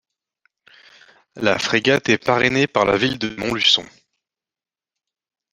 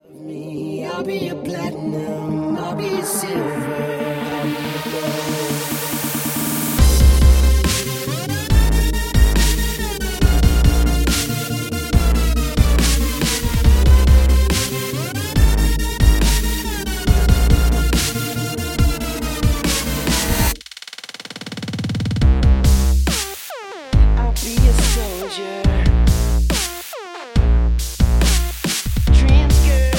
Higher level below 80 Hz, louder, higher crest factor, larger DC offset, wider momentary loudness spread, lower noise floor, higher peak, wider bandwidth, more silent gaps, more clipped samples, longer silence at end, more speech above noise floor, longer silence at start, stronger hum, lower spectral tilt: second, -54 dBFS vs -18 dBFS; about the same, -18 LUFS vs -18 LUFS; first, 22 dB vs 16 dB; neither; second, 7 LU vs 11 LU; first, under -90 dBFS vs -36 dBFS; about the same, 0 dBFS vs 0 dBFS; second, 14 kHz vs 17 kHz; neither; neither; first, 1.7 s vs 0 s; first, over 71 dB vs 13 dB; first, 1.35 s vs 0.15 s; neither; about the same, -4 dB/octave vs -4.5 dB/octave